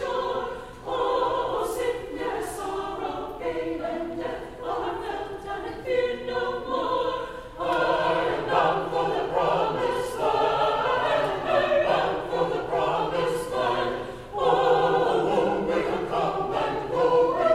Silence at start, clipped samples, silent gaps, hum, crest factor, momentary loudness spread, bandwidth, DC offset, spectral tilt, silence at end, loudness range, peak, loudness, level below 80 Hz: 0 s; under 0.1%; none; none; 16 dB; 10 LU; 14.5 kHz; under 0.1%; -5 dB/octave; 0 s; 6 LU; -8 dBFS; -26 LUFS; -50 dBFS